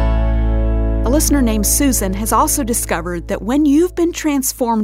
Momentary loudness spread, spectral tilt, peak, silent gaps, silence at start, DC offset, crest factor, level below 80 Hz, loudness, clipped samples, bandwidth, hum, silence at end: 5 LU; -4.5 dB/octave; -2 dBFS; none; 0 s; under 0.1%; 14 dB; -20 dBFS; -16 LUFS; under 0.1%; 16.5 kHz; none; 0 s